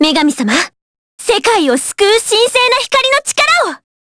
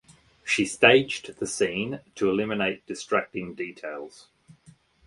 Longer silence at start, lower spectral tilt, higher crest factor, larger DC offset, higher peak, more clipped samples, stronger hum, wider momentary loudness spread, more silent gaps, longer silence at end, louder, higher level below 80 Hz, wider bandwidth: second, 0 s vs 0.45 s; second, -1.5 dB/octave vs -3.5 dB/octave; second, 12 dB vs 26 dB; neither; about the same, 0 dBFS vs -2 dBFS; neither; neither; second, 8 LU vs 19 LU; first, 0.82-1.18 s vs none; second, 0.35 s vs 0.55 s; first, -11 LUFS vs -25 LUFS; first, -50 dBFS vs -62 dBFS; about the same, 11 kHz vs 11.5 kHz